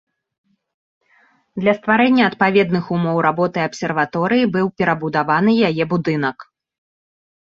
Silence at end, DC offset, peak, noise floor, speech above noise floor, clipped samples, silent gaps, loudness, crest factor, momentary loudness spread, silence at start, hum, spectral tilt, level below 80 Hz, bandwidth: 1.05 s; under 0.1%; -2 dBFS; -57 dBFS; 40 dB; under 0.1%; none; -17 LUFS; 18 dB; 6 LU; 1.55 s; none; -7 dB/octave; -58 dBFS; 7.6 kHz